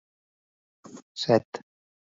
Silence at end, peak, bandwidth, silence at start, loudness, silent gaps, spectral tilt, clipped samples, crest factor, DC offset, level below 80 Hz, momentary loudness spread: 0.6 s; -6 dBFS; 7.8 kHz; 0.95 s; -25 LUFS; 1.02-1.15 s, 1.45-1.52 s; -5.5 dB/octave; under 0.1%; 24 dB; under 0.1%; -72 dBFS; 24 LU